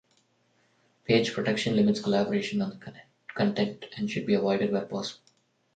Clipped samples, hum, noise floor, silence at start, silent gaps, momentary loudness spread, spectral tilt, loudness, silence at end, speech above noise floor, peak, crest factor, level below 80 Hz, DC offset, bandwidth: under 0.1%; none; -69 dBFS; 1.1 s; none; 16 LU; -6 dB/octave; -28 LUFS; 0.6 s; 42 dB; -10 dBFS; 20 dB; -68 dBFS; under 0.1%; 9 kHz